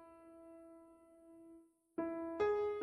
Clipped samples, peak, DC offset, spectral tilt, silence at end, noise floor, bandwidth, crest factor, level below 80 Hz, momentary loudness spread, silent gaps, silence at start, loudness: under 0.1%; -26 dBFS; under 0.1%; -6.5 dB/octave; 0 s; -64 dBFS; 10.5 kHz; 18 dB; -74 dBFS; 26 LU; none; 0 s; -40 LUFS